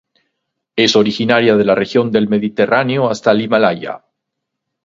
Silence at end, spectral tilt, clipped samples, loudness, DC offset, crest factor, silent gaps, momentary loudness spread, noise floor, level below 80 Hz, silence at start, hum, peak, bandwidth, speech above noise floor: 0.9 s; -5.5 dB/octave; under 0.1%; -14 LUFS; under 0.1%; 14 dB; none; 9 LU; -77 dBFS; -56 dBFS; 0.75 s; none; 0 dBFS; 7.8 kHz; 64 dB